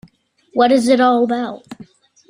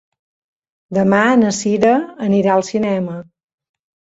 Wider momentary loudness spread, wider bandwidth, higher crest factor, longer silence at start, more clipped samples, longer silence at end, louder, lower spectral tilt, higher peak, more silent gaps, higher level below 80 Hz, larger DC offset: first, 14 LU vs 10 LU; first, 14.5 kHz vs 8 kHz; about the same, 16 dB vs 16 dB; second, 0.55 s vs 0.9 s; neither; second, 0.45 s vs 0.9 s; about the same, -15 LUFS vs -15 LUFS; about the same, -4.5 dB/octave vs -5.5 dB/octave; about the same, -2 dBFS vs -2 dBFS; neither; about the same, -62 dBFS vs -58 dBFS; neither